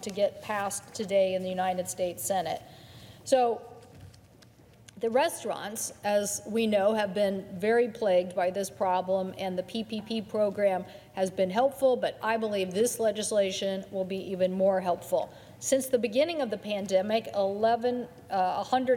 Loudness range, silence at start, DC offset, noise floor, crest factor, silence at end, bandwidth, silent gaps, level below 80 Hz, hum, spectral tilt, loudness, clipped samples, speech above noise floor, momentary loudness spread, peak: 4 LU; 0 s; under 0.1%; -56 dBFS; 18 dB; 0 s; 17.5 kHz; none; -68 dBFS; none; -4 dB/octave; -29 LUFS; under 0.1%; 28 dB; 8 LU; -10 dBFS